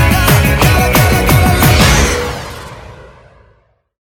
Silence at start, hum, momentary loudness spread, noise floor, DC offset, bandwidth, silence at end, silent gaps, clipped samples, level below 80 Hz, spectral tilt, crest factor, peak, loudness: 0 s; none; 17 LU; -53 dBFS; under 0.1%; 18.5 kHz; 1 s; none; under 0.1%; -18 dBFS; -4.5 dB/octave; 12 dB; 0 dBFS; -10 LUFS